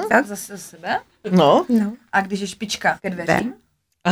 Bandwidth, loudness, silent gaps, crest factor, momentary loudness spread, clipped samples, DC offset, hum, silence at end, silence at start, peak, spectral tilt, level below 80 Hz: over 20 kHz; -20 LUFS; none; 20 dB; 15 LU; under 0.1%; under 0.1%; none; 0 s; 0 s; 0 dBFS; -5 dB/octave; -58 dBFS